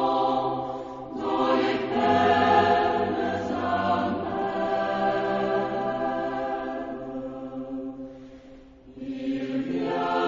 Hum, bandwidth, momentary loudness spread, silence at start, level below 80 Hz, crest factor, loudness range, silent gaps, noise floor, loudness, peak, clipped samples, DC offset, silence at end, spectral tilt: none; 7.6 kHz; 15 LU; 0 s; -56 dBFS; 18 dB; 10 LU; none; -48 dBFS; -26 LUFS; -8 dBFS; under 0.1%; under 0.1%; 0 s; -6.5 dB/octave